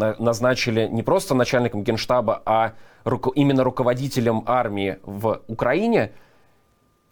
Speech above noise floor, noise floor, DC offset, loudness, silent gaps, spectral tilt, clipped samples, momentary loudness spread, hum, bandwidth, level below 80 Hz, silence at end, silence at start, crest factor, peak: 41 dB; -62 dBFS; under 0.1%; -22 LUFS; none; -6 dB/octave; under 0.1%; 7 LU; none; 20 kHz; -50 dBFS; 0.95 s; 0 s; 14 dB; -6 dBFS